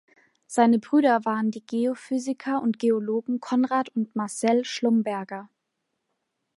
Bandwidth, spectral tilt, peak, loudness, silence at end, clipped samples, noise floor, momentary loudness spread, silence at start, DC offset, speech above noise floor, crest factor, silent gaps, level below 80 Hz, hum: 11.5 kHz; -5 dB/octave; -6 dBFS; -25 LUFS; 1.1 s; under 0.1%; -79 dBFS; 9 LU; 0.5 s; under 0.1%; 55 dB; 20 dB; none; -78 dBFS; none